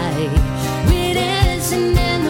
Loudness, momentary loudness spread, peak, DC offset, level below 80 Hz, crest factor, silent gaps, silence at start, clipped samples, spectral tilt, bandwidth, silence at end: -17 LUFS; 2 LU; 0 dBFS; under 0.1%; -22 dBFS; 16 dB; none; 0 s; under 0.1%; -5 dB/octave; 18 kHz; 0 s